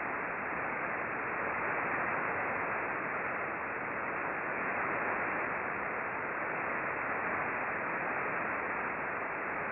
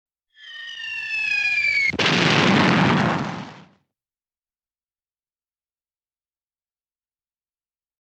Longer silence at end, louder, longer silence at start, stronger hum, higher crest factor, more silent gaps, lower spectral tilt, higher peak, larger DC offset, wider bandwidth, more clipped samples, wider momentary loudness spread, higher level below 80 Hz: second, 0 s vs 4.4 s; second, -34 LUFS vs -19 LUFS; second, 0 s vs 0.4 s; neither; second, 14 dB vs 20 dB; neither; first, -9 dB/octave vs -4.5 dB/octave; second, -22 dBFS vs -4 dBFS; neither; second, 4 kHz vs 9.4 kHz; neither; second, 3 LU vs 19 LU; second, -66 dBFS vs -58 dBFS